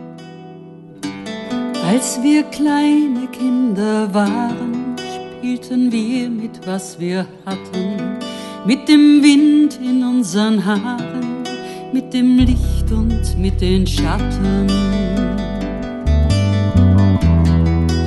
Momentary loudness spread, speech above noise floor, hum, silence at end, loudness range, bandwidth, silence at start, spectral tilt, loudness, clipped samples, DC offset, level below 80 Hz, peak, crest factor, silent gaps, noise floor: 13 LU; 22 dB; none; 0 s; 7 LU; 12 kHz; 0 s; -6.5 dB/octave; -16 LUFS; under 0.1%; under 0.1%; -26 dBFS; 0 dBFS; 16 dB; none; -37 dBFS